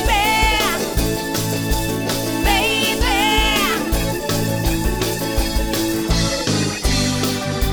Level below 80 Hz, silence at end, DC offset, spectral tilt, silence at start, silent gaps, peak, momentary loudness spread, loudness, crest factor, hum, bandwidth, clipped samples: -26 dBFS; 0 s; under 0.1%; -3.5 dB/octave; 0 s; none; -4 dBFS; 6 LU; -18 LUFS; 16 dB; none; over 20 kHz; under 0.1%